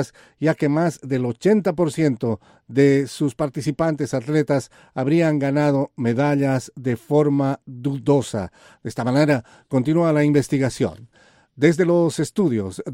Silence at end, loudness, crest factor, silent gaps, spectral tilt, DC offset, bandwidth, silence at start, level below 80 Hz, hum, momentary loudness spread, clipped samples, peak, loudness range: 0 s; -21 LUFS; 18 dB; none; -7 dB/octave; under 0.1%; 16 kHz; 0 s; -56 dBFS; none; 9 LU; under 0.1%; -2 dBFS; 1 LU